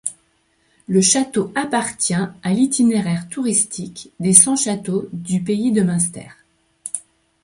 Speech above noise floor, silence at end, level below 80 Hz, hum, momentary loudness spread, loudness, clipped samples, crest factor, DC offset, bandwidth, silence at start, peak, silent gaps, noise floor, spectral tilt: 44 dB; 0.45 s; -60 dBFS; none; 16 LU; -17 LUFS; under 0.1%; 20 dB; under 0.1%; 16 kHz; 0.05 s; 0 dBFS; none; -62 dBFS; -4 dB/octave